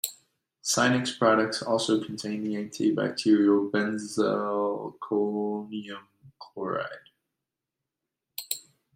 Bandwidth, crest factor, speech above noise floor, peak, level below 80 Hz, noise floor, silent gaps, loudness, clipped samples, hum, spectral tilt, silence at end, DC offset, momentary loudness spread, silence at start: 16 kHz; 20 dB; 61 dB; -8 dBFS; -72 dBFS; -87 dBFS; none; -27 LUFS; under 0.1%; none; -4 dB/octave; 0.35 s; under 0.1%; 15 LU; 0.05 s